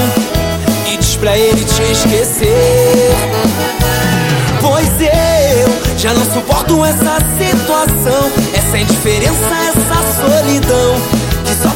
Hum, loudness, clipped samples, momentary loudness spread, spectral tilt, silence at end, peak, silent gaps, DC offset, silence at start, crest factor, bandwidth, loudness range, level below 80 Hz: none; -11 LUFS; under 0.1%; 4 LU; -4.5 dB/octave; 0 s; 0 dBFS; none; under 0.1%; 0 s; 10 dB; 17 kHz; 1 LU; -24 dBFS